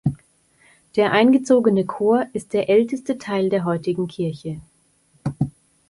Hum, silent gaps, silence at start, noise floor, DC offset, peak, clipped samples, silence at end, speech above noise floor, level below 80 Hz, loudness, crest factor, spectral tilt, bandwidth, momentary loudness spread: none; none; 0.05 s; -60 dBFS; under 0.1%; -4 dBFS; under 0.1%; 0.4 s; 41 dB; -54 dBFS; -20 LUFS; 18 dB; -7 dB/octave; 11.5 kHz; 15 LU